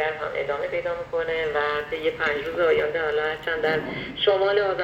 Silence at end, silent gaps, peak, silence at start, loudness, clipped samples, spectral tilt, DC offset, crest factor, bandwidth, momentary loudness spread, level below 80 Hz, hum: 0 s; none; -6 dBFS; 0 s; -24 LUFS; under 0.1%; -5 dB/octave; under 0.1%; 18 dB; 13 kHz; 6 LU; -52 dBFS; none